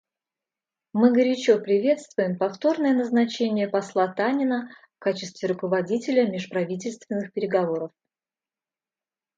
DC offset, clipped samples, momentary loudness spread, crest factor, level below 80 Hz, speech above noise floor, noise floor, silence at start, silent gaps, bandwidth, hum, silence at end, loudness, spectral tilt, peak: under 0.1%; under 0.1%; 10 LU; 18 dB; -76 dBFS; over 67 dB; under -90 dBFS; 0.95 s; none; 8.6 kHz; none; 1.5 s; -24 LUFS; -6 dB/octave; -6 dBFS